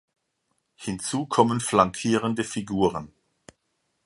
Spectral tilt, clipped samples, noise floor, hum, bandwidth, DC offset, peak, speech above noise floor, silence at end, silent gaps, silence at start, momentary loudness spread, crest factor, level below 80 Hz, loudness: -5 dB/octave; under 0.1%; -75 dBFS; none; 11.5 kHz; under 0.1%; -2 dBFS; 51 dB; 1 s; none; 0.8 s; 12 LU; 24 dB; -56 dBFS; -24 LUFS